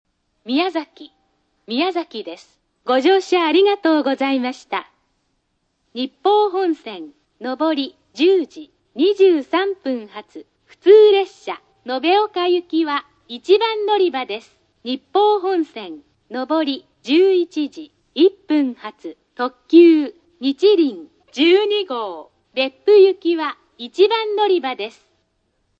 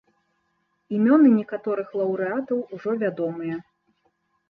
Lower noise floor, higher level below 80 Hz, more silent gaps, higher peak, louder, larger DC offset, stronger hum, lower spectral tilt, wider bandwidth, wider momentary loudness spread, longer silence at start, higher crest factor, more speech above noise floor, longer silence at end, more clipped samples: about the same, -69 dBFS vs -72 dBFS; about the same, -72 dBFS vs -72 dBFS; neither; first, 0 dBFS vs -6 dBFS; first, -17 LUFS vs -23 LUFS; neither; neither; second, -4 dB/octave vs -10.5 dB/octave; first, 7.8 kHz vs 5 kHz; first, 18 LU vs 14 LU; second, 0.45 s vs 0.9 s; about the same, 18 dB vs 18 dB; about the same, 52 dB vs 50 dB; about the same, 0.9 s vs 0.9 s; neither